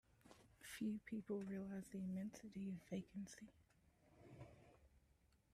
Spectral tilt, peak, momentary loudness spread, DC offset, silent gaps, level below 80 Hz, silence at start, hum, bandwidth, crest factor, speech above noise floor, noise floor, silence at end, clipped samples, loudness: -6.5 dB/octave; -36 dBFS; 20 LU; under 0.1%; none; -78 dBFS; 0.25 s; none; 14 kHz; 16 dB; 28 dB; -77 dBFS; 0.55 s; under 0.1%; -51 LUFS